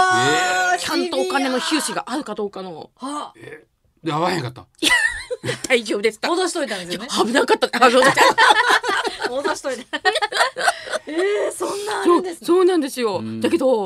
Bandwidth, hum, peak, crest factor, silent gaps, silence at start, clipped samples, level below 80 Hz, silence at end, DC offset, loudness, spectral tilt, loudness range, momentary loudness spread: 15.5 kHz; none; 0 dBFS; 20 dB; none; 0 s; under 0.1%; -58 dBFS; 0 s; under 0.1%; -19 LUFS; -3 dB/octave; 8 LU; 14 LU